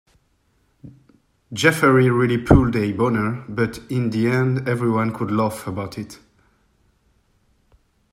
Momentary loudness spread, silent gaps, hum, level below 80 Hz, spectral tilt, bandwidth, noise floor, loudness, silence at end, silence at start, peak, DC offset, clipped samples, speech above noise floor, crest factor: 13 LU; none; none; -38 dBFS; -6.5 dB/octave; 16 kHz; -64 dBFS; -19 LUFS; 2 s; 0.85 s; 0 dBFS; under 0.1%; under 0.1%; 45 dB; 20 dB